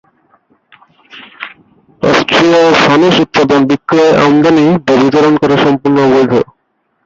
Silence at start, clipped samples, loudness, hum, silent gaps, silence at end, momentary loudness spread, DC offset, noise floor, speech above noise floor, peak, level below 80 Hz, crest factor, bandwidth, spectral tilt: 1.15 s; under 0.1%; -8 LUFS; none; none; 0.6 s; 9 LU; under 0.1%; -62 dBFS; 54 dB; 0 dBFS; -46 dBFS; 10 dB; 7.8 kHz; -5.5 dB/octave